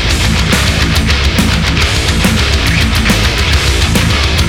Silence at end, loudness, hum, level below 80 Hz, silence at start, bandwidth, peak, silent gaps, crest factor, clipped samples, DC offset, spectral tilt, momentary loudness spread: 0 s; -10 LUFS; none; -16 dBFS; 0 s; 18 kHz; 0 dBFS; none; 10 dB; under 0.1%; under 0.1%; -4 dB/octave; 1 LU